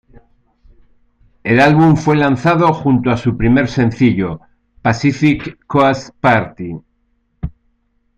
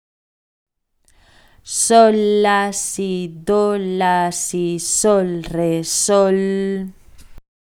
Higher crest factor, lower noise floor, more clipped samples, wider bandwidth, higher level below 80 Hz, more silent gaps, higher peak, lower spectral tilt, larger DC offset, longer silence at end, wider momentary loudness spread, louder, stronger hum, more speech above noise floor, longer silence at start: about the same, 14 dB vs 18 dB; about the same, -62 dBFS vs -59 dBFS; neither; second, 8.6 kHz vs 17.5 kHz; first, -38 dBFS vs -48 dBFS; neither; about the same, 0 dBFS vs 0 dBFS; first, -7.5 dB/octave vs -4 dB/octave; neither; first, 0.65 s vs 0.4 s; first, 17 LU vs 10 LU; first, -14 LUFS vs -17 LUFS; neither; first, 49 dB vs 42 dB; second, 1.45 s vs 1.65 s